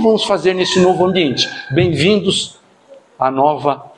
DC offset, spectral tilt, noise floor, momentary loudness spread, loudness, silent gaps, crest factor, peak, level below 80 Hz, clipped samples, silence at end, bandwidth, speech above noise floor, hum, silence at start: under 0.1%; -5 dB/octave; -44 dBFS; 6 LU; -14 LUFS; none; 14 dB; 0 dBFS; -50 dBFS; under 0.1%; 0.1 s; 11 kHz; 30 dB; none; 0 s